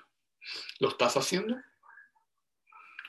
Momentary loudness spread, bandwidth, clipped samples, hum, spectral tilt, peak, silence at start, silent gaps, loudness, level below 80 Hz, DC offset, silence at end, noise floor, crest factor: 18 LU; 13 kHz; under 0.1%; none; -3.5 dB/octave; -12 dBFS; 0.4 s; none; -31 LUFS; -78 dBFS; under 0.1%; 0 s; -79 dBFS; 22 dB